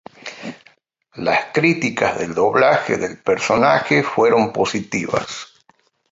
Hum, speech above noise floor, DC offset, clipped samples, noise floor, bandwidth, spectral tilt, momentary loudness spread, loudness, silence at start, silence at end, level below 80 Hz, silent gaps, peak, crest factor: none; 41 dB; under 0.1%; under 0.1%; -59 dBFS; 7.8 kHz; -5 dB/octave; 17 LU; -17 LUFS; 0.25 s; 0.65 s; -56 dBFS; none; -2 dBFS; 18 dB